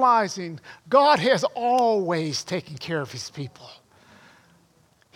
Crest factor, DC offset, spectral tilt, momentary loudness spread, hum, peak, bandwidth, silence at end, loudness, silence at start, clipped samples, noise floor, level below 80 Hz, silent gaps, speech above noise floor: 20 dB; under 0.1%; -4.5 dB/octave; 18 LU; none; -4 dBFS; 15.5 kHz; 1.45 s; -23 LUFS; 0 s; under 0.1%; -61 dBFS; -70 dBFS; none; 38 dB